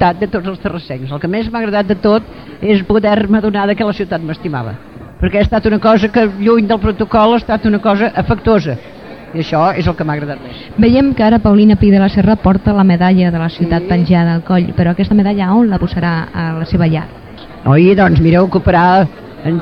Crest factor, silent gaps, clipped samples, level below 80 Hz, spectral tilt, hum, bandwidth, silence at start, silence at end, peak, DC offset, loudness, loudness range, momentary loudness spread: 12 dB; none; under 0.1%; -30 dBFS; -9.5 dB/octave; none; 6 kHz; 0 s; 0 s; 0 dBFS; 0.4%; -12 LUFS; 4 LU; 12 LU